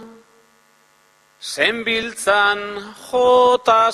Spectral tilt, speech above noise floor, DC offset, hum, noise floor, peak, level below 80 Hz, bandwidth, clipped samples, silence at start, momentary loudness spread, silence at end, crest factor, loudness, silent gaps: -2 dB/octave; 39 dB; under 0.1%; none; -56 dBFS; -2 dBFS; -58 dBFS; 14.5 kHz; under 0.1%; 0 s; 16 LU; 0 s; 16 dB; -16 LUFS; none